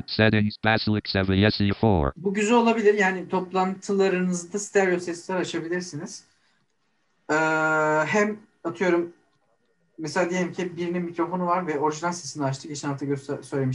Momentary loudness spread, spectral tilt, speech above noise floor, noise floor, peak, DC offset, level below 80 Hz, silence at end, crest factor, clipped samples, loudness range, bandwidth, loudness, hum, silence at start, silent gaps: 10 LU; -5.5 dB/octave; 48 dB; -72 dBFS; -6 dBFS; under 0.1%; -48 dBFS; 0 s; 20 dB; under 0.1%; 6 LU; 11.5 kHz; -24 LUFS; none; 0.1 s; none